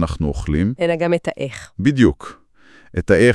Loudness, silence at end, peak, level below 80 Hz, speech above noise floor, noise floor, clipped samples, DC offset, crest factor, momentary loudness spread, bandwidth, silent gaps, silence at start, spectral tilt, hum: -19 LUFS; 0 s; 0 dBFS; -34 dBFS; 31 dB; -48 dBFS; under 0.1%; under 0.1%; 18 dB; 13 LU; 12 kHz; none; 0 s; -7 dB/octave; none